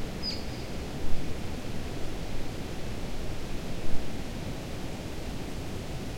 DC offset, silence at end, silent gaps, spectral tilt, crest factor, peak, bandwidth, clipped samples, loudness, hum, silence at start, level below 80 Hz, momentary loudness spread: under 0.1%; 0 s; none; -5 dB/octave; 18 dB; -10 dBFS; 15.5 kHz; under 0.1%; -37 LUFS; none; 0 s; -38 dBFS; 2 LU